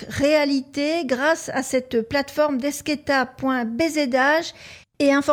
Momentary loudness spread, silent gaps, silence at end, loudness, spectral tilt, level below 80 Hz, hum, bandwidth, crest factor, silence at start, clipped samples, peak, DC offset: 6 LU; none; 0 s; -21 LUFS; -3.5 dB/octave; -54 dBFS; none; 17.5 kHz; 14 dB; 0 s; under 0.1%; -6 dBFS; under 0.1%